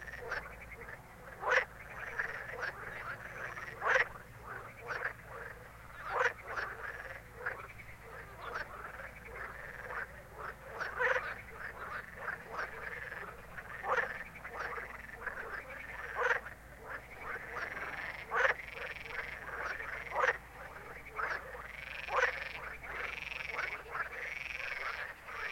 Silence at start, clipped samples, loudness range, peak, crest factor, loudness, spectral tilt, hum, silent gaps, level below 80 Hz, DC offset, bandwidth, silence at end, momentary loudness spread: 0 s; under 0.1%; 4 LU; -12 dBFS; 28 dB; -39 LUFS; -3.5 dB/octave; none; none; -60 dBFS; under 0.1%; 16.5 kHz; 0 s; 15 LU